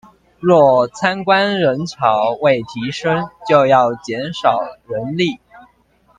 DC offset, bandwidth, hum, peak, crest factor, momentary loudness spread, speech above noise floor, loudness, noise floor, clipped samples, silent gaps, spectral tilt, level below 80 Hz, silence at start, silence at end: under 0.1%; 9.4 kHz; none; 0 dBFS; 16 dB; 12 LU; 40 dB; -16 LUFS; -55 dBFS; under 0.1%; none; -6 dB/octave; -56 dBFS; 0.4 s; 0.6 s